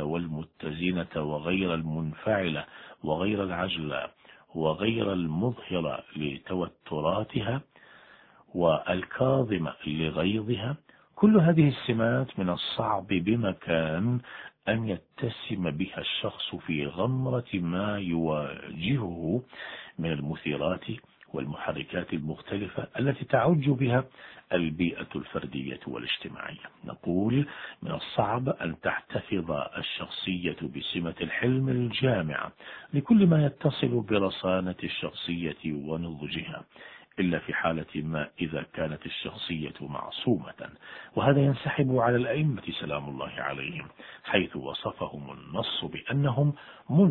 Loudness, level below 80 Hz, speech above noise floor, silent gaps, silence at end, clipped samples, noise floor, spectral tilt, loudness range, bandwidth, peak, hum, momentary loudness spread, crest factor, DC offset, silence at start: -29 LUFS; -56 dBFS; 28 dB; none; 0 s; under 0.1%; -56 dBFS; -10.5 dB/octave; 6 LU; 4.6 kHz; -8 dBFS; none; 12 LU; 20 dB; under 0.1%; 0 s